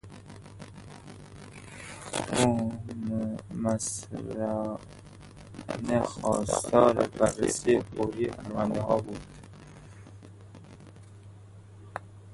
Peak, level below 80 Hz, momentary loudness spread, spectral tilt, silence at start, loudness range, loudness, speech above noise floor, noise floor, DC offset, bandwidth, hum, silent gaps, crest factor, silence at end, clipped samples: -6 dBFS; -54 dBFS; 24 LU; -5 dB/octave; 0.05 s; 9 LU; -29 LUFS; 22 dB; -49 dBFS; under 0.1%; 11.5 kHz; none; none; 26 dB; 0 s; under 0.1%